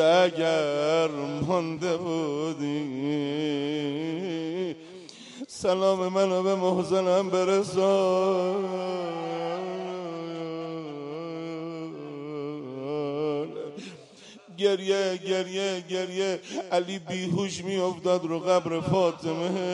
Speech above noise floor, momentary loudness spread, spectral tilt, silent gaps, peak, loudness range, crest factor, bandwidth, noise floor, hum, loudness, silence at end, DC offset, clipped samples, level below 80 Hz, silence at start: 24 dB; 12 LU; -5.5 dB/octave; none; -10 dBFS; 9 LU; 18 dB; 11.5 kHz; -49 dBFS; none; -28 LUFS; 0 s; under 0.1%; under 0.1%; -68 dBFS; 0 s